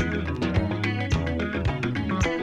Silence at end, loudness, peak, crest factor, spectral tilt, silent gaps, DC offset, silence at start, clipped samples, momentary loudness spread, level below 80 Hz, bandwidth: 0 s; -26 LUFS; -10 dBFS; 16 dB; -6.5 dB/octave; none; under 0.1%; 0 s; under 0.1%; 2 LU; -36 dBFS; 9.4 kHz